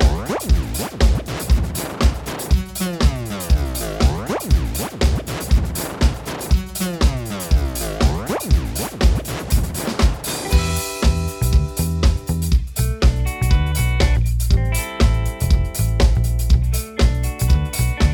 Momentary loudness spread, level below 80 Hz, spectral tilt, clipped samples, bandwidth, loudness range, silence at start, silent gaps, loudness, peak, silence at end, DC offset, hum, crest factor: 5 LU; -20 dBFS; -5 dB/octave; under 0.1%; 19 kHz; 2 LU; 0 s; none; -20 LUFS; -4 dBFS; 0 s; under 0.1%; none; 14 dB